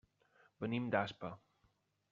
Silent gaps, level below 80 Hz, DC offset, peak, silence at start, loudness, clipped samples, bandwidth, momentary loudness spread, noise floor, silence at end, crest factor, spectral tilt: none; -78 dBFS; under 0.1%; -18 dBFS; 0.6 s; -40 LUFS; under 0.1%; 7.4 kHz; 13 LU; -78 dBFS; 0.75 s; 24 dB; -5 dB/octave